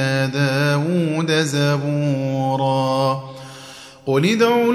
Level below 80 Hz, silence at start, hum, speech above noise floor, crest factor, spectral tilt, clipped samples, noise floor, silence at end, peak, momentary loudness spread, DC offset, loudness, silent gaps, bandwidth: -62 dBFS; 0 s; none; 21 dB; 14 dB; -6 dB/octave; under 0.1%; -39 dBFS; 0 s; -4 dBFS; 18 LU; under 0.1%; -19 LUFS; none; 14.5 kHz